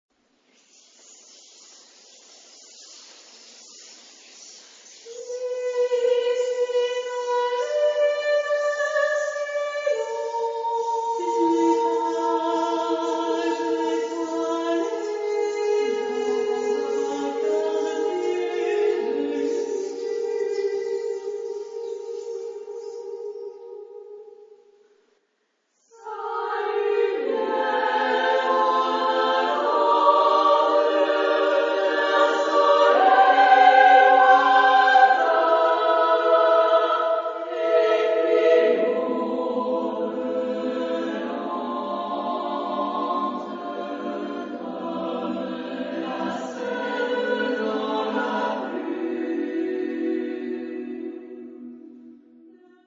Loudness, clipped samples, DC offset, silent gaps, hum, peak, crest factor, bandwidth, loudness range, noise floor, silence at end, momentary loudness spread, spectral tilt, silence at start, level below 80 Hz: -22 LUFS; under 0.1%; under 0.1%; none; none; -4 dBFS; 20 dB; 7.6 kHz; 14 LU; -72 dBFS; 0.7 s; 16 LU; -3.5 dB/octave; 2.75 s; -78 dBFS